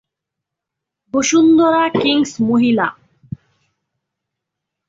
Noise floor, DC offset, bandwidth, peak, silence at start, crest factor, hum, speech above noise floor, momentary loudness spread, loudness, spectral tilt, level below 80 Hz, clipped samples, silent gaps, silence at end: -82 dBFS; under 0.1%; 7.8 kHz; -4 dBFS; 1.15 s; 14 dB; none; 68 dB; 23 LU; -14 LUFS; -4 dB/octave; -56 dBFS; under 0.1%; none; 1.95 s